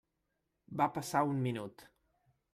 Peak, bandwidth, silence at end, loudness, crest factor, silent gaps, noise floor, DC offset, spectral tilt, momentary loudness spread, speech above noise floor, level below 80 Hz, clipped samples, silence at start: -18 dBFS; 15 kHz; 0.7 s; -35 LUFS; 20 dB; none; -84 dBFS; under 0.1%; -6 dB/octave; 13 LU; 49 dB; -74 dBFS; under 0.1%; 0.7 s